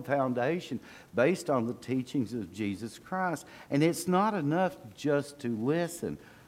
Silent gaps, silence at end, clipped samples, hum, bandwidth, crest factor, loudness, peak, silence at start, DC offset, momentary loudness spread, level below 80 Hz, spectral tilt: none; 0.15 s; under 0.1%; none; 16.5 kHz; 18 dB; -31 LUFS; -12 dBFS; 0 s; under 0.1%; 9 LU; -68 dBFS; -6 dB/octave